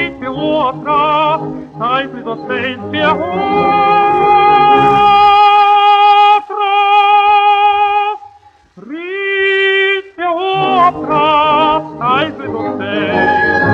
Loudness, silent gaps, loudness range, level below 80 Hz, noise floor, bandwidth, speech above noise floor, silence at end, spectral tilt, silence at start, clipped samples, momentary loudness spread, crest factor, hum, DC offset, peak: -11 LUFS; none; 6 LU; -48 dBFS; -44 dBFS; 7 kHz; 30 dB; 0 s; -6 dB/octave; 0 s; under 0.1%; 12 LU; 10 dB; none; under 0.1%; 0 dBFS